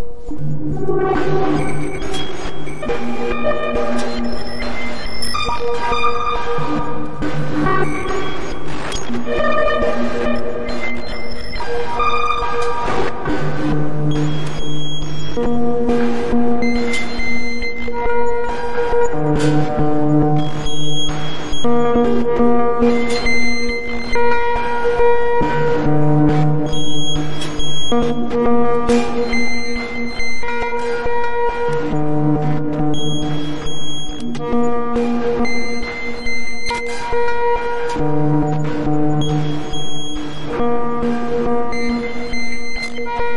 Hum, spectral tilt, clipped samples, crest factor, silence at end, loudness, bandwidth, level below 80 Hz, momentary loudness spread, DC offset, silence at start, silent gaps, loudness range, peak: none; -6 dB/octave; under 0.1%; 10 dB; 0 s; -20 LUFS; 11.5 kHz; -32 dBFS; 9 LU; under 0.1%; 0 s; none; 4 LU; -2 dBFS